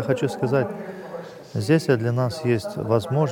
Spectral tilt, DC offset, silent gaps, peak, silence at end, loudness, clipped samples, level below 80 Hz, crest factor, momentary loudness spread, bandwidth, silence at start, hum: -7 dB/octave; under 0.1%; none; -6 dBFS; 0 s; -23 LUFS; under 0.1%; -60 dBFS; 16 dB; 14 LU; 17 kHz; 0 s; none